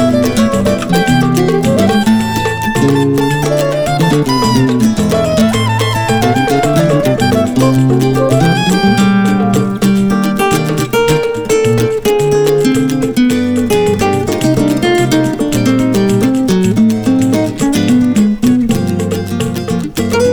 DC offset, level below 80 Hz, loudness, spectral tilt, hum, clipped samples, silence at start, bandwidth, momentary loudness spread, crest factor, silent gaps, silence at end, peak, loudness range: under 0.1%; -34 dBFS; -11 LUFS; -6 dB/octave; none; under 0.1%; 0 s; over 20 kHz; 3 LU; 10 dB; none; 0 s; 0 dBFS; 1 LU